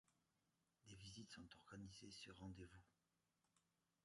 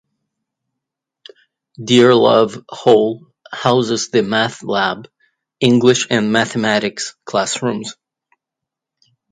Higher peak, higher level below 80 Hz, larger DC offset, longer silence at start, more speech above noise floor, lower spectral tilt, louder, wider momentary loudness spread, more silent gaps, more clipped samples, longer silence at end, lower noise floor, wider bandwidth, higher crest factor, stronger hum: second, -46 dBFS vs 0 dBFS; second, -76 dBFS vs -60 dBFS; neither; second, 0.1 s vs 1.8 s; second, 28 dB vs 68 dB; about the same, -4 dB/octave vs -4.5 dB/octave; second, -61 LUFS vs -15 LUFS; second, 4 LU vs 15 LU; neither; neither; second, 0.45 s vs 1.4 s; first, -89 dBFS vs -83 dBFS; about the same, 11 kHz vs 10 kHz; about the same, 18 dB vs 18 dB; neither